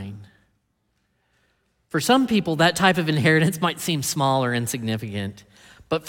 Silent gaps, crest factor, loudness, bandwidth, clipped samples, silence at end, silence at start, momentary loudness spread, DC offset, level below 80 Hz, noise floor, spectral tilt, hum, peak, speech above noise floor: none; 20 dB; -21 LUFS; 17.5 kHz; under 0.1%; 0 s; 0 s; 11 LU; under 0.1%; -60 dBFS; -71 dBFS; -4.5 dB/octave; none; -4 dBFS; 50 dB